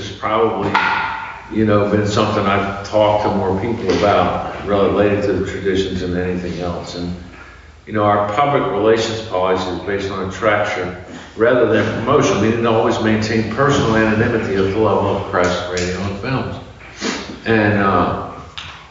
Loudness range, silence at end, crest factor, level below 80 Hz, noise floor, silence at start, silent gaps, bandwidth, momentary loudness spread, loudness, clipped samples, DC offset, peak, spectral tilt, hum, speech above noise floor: 4 LU; 0.05 s; 16 dB; -40 dBFS; -39 dBFS; 0 s; none; 7.8 kHz; 11 LU; -17 LUFS; under 0.1%; under 0.1%; -2 dBFS; -4.5 dB/octave; none; 23 dB